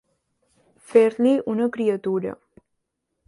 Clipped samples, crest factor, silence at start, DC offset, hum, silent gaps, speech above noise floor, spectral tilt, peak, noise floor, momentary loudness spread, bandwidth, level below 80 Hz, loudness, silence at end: under 0.1%; 20 dB; 0.9 s; under 0.1%; none; none; 58 dB; -7 dB/octave; -4 dBFS; -78 dBFS; 9 LU; 11.5 kHz; -68 dBFS; -21 LUFS; 0.95 s